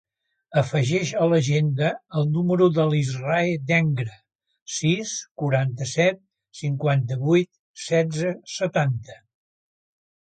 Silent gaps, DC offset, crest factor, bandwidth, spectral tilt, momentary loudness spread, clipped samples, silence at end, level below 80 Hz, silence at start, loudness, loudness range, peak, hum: 4.62-4.66 s, 5.31-5.35 s, 7.59-7.74 s; under 0.1%; 18 dB; 9.2 kHz; -6 dB/octave; 9 LU; under 0.1%; 1.1 s; -62 dBFS; 0.5 s; -23 LUFS; 4 LU; -6 dBFS; none